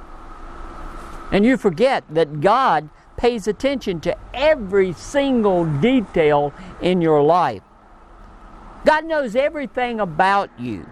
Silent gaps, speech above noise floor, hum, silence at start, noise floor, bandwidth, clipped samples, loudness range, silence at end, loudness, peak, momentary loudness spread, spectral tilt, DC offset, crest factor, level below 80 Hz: none; 27 dB; none; 0 s; -45 dBFS; 12.5 kHz; under 0.1%; 3 LU; 0 s; -19 LUFS; 0 dBFS; 17 LU; -6.5 dB/octave; under 0.1%; 18 dB; -40 dBFS